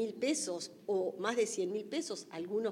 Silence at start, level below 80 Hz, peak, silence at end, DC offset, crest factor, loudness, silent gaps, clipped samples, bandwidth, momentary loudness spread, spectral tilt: 0 s; -90 dBFS; -18 dBFS; 0 s; under 0.1%; 18 dB; -36 LUFS; none; under 0.1%; 16 kHz; 7 LU; -3 dB/octave